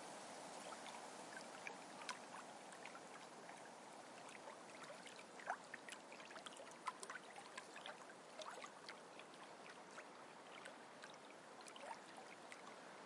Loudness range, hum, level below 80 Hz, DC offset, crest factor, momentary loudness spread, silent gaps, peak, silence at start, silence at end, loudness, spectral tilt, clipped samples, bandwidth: 4 LU; none; under -90 dBFS; under 0.1%; 28 dB; 6 LU; none; -28 dBFS; 0 s; 0 s; -55 LUFS; -2 dB/octave; under 0.1%; 12 kHz